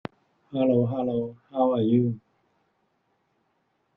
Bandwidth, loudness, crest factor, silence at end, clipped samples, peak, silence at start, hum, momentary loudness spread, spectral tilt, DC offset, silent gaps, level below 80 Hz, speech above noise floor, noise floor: 4.5 kHz; -25 LUFS; 18 dB; 1.8 s; under 0.1%; -10 dBFS; 0.5 s; none; 13 LU; -11.5 dB/octave; under 0.1%; none; -66 dBFS; 48 dB; -72 dBFS